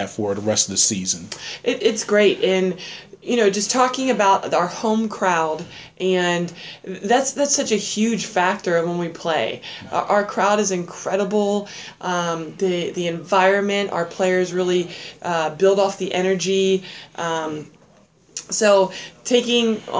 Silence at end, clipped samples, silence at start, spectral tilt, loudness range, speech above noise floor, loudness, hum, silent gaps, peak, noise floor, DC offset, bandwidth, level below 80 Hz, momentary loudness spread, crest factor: 0 s; under 0.1%; 0 s; -3.5 dB/octave; 2 LU; 33 dB; -20 LUFS; none; none; -2 dBFS; -53 dBFS; under 0.1%; 8 kHz; -62 dBFS; 13 LU; 18 dB